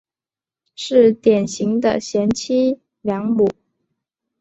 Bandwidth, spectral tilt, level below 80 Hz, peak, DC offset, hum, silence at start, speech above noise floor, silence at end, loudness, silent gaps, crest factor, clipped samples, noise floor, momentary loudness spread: 8.2 kHz; -5.5 dB/octave; -56 dBFS; -2 dBFS; under 0.1%; none; 0.8 s; over 73 dB; 0.9 s; -18 LUFS; none; 16 dB; under 0.1%; under -90 dBFS; 9 LU